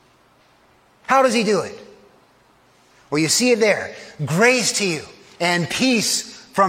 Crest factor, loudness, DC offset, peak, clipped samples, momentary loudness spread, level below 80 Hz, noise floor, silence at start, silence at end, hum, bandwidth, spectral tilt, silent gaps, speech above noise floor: 18 dB; -18 LUFS; under 0.1%; -2 dBFS; under 0.1%; 13 LU; -64 dBFS; -55 dBFS; 1.1 s; 0 s; none; 16.5 kHz; -3 dB/octave; none; 37 dB